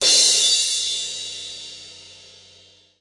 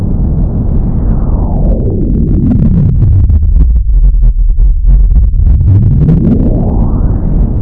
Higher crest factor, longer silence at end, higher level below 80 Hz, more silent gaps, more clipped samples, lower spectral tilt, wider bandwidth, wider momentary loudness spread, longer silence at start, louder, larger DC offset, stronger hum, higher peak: first, 18 dB vs 6 dB; first, 0.85 s vs 0 s; second, -68 dBFS vs -8 dBFS; neither; second, under 0.1% vs 0.4%; second, 2.5 dB/octave vs -13.5 dB/octave; first, 12 kHz vs 1.7 kHz; first, 23 LU vs 5 LU; about the same, 0 s vs 0 s; second, -17 LUFS vs -10 LUFS; neither; neither; second, -4 dBFS vs 0 dBFS